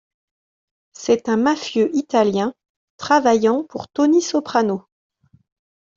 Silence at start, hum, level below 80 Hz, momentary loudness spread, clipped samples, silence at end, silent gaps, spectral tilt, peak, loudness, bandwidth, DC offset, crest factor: 1 s; none; -62 dBFS; 11 LU; under 0.1%; 1.15 s; 2.69-2.98 s; -4.5 dB/octave; -2 dBFS; -19 LUFS; 7.8 kHz; under 0.1%; 18 dB